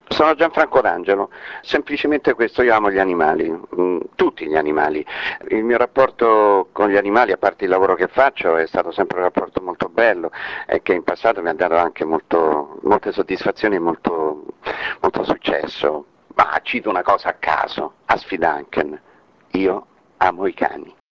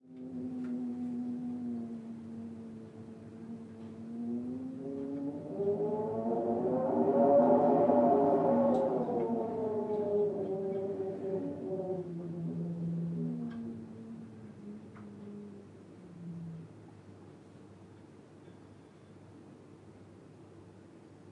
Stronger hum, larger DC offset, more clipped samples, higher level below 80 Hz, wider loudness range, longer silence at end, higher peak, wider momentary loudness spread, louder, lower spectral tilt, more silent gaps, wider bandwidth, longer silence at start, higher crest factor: neither; neither; neither; first, -52 dBFS vs -76 dBFS; second, 5 LU vs 21 LU; first, 0.25 s vs 0 s; first, 0 dBFS vs -14 dBFS; second, 9 LU vs 28 LU; first, -18 LUFS vs -33 LUFS; second, -6.5 dB/octave vs -10 dB/octave; neither; second, 7 kHz vs 9 kHz; about the same, 0.1 s vs 0.05 s; about the same, 18 dB vs 20 dB